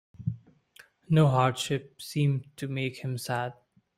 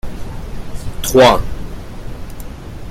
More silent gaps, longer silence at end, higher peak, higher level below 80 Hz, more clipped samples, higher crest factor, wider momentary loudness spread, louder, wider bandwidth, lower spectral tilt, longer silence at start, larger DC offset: neither; first, 0.45 s vs 0 s; second, -10 dBFS vs 0 dBFS; second, -62 dBFS vs -28 dBFS; neither; about the same, 20 dB vs 16 dB; second, 14 LU vs 22 LU; second, -29 LUFS vs -12 LUFS; about the same, 15.5 kHz vs 16.5 kHz; first, -6 dB/octave vs -4.5 dB/octave; first, 0.2 s vs 0.05 s; neither